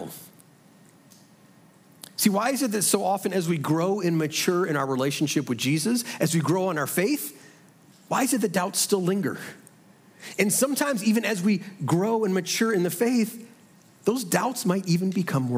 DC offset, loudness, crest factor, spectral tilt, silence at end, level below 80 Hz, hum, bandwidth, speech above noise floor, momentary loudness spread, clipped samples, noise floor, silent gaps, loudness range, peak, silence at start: under 0.1%; -24 LUFS; 18 dB; -4.5 dB/octave; 0 s; -76 dBFS; none; 16.5 kHz; 30 dB; 7 LU; under 0.1%; -55 dBFS; none; 2 LU; -8 dBFS; 0 s